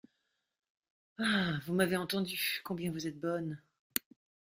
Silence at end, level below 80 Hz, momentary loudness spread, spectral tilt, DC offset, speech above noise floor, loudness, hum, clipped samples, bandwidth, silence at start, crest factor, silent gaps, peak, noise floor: 1 s; -70 dBFS; 7 LU; -4.5 dB/octave; under 0.1%; 48 dB; -35 LUFS; none; under 0.1%; 16 kHz; 1.2 s; 26 dB; none; -10 dBFS; -82 dBFS